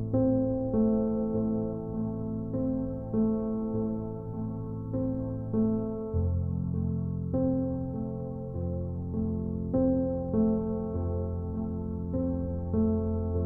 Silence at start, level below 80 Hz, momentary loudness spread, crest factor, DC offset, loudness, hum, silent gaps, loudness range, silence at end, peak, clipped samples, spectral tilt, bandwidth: 0 s; -44 dBFS; 8 LU; 14 dB; under 0.1%; -31 LUFS; none; none; 2 LU; 0 s; -16 dBFS; under 0.1%; -14.5 dB/octave; 1.7 kHz